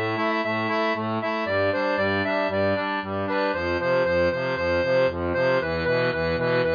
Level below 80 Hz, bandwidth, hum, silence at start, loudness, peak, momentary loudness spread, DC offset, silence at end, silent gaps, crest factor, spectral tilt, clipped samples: -50 dBFS; 5.2 kHz; none; 0 s; -24 LUFS; -10 dBFS; 3 LU; under 0.1%; 0 s; none; 12 dB; -7 dB/octave; under 0.1%